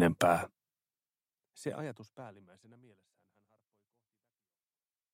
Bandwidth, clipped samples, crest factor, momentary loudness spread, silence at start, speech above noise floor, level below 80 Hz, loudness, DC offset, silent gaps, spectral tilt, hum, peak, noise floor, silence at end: 16 kHz; under 0.1%; 26 dB; 23 LU; 0 s; over 54 dB; -68 dBFS; -34 LUFS; under 0.1%; none; -5.5 dB/octave; none; -12 dBFS; under -90 dBFS; 2.85 s